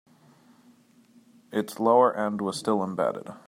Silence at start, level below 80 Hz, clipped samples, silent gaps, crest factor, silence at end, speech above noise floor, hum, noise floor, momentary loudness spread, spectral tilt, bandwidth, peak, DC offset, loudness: 1.5 s; -76 dBFS; under 0.1%; none; 20 dB; 0.1 s; 33 dB; none; -58 dBFS; 11 LU; -5.5 dB/octave; 16 kHz; -8 dBFS; under 0.1%; -25 LUFS